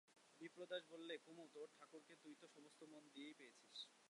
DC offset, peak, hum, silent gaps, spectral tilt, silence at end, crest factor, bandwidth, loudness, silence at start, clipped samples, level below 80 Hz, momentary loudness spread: under 0.1%; -36 dBFS; none; none; -3 dB/octave; 0 s; 24 dB; 11 kHz; -59 LUFS; 0.05 s; under 0.1%; under -90 dBFS; 12 LU